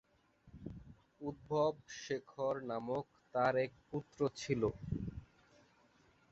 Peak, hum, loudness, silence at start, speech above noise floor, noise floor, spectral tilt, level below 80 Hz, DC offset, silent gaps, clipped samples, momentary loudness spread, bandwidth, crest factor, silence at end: -20 dBFS; none; -39 LUFS; 0.45 s; 32 dB; -70 dBFS; -5.5 dB/octave; -62 dBFS; under 0.1%; none; under 0.1%; 17 LU; 8 kHz; 22 dB; 1.05 s